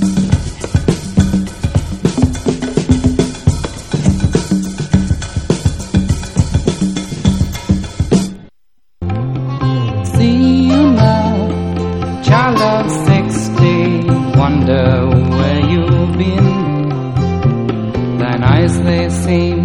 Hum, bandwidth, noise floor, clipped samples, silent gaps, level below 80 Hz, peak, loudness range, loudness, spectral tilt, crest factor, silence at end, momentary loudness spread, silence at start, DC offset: none; 12 kHz; -69 dBFS; 0.1%; none; -26 dBFS; 0 dBFS; 4 LU; -14 LUFS; -7 dB/octave; 12 dB; 0 s; 7 LU; 0 s; 0.6%